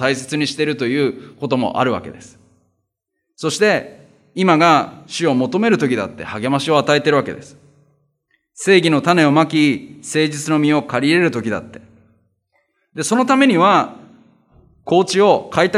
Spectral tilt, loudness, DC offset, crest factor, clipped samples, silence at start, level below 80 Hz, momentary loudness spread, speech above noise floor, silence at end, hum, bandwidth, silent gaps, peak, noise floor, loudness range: -5 dB/octave; -16 LUFS; under 0.1%; 16 dB; under 0.1%; 0 s; -64 dBFS; 13 LU; 59 dB; 0 s; none; 13.5 kHz; none; 0 dBFS; -75 dBFS; 5 LU